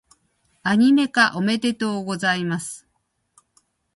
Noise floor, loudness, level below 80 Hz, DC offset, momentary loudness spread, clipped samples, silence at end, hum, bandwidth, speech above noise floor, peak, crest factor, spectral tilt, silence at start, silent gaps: -71 dBFS; -20 LUFS; -66 dBFS; under 0.1%; 12 LU; under 0.1%; 1.2 s; none; 11.5 kHz; 51 dB; -2 dBFS; 20 dB; -4.5 dB/octave; 0.65 s; none